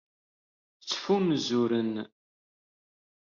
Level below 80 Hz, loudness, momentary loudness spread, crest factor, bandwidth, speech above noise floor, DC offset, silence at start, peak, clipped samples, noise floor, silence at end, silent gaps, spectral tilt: -76 dBFS; -28 LUFS; 15 LU; 16 dB; 7.2 kHz; over 63 dB; under 0.1%; 0.85 s; -14 dBFS; under 0.1%; under -90 dBFS; 1.2 s; none; -4.5 dB/octave